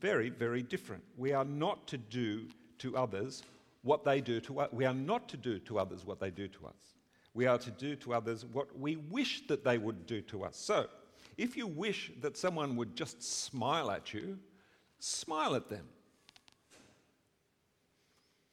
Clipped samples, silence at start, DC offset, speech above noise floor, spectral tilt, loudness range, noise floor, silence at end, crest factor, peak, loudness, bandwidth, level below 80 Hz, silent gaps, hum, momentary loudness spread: under 0.1%; 0 s; under 0.1%; 40 dB; -4.5 dB/octave; 5 LU; -77 dBFS; 1.75 s; 22 dB; -16 dBFS; -37 LUFS; 15 kHz; -74 dBFS; none; none; 11 LU